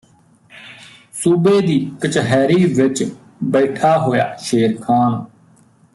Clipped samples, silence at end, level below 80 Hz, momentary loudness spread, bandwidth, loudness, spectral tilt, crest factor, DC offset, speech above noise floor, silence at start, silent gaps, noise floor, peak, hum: under 0.1%; 0.7 s; -58 dBFS; 13 LU; 12 kHz; -16 LUFS; -6 dB/octave; 14 dB; under 0.1%; 36 dB; 0.55 s; none; -51 dBFS; -2 dBFS; none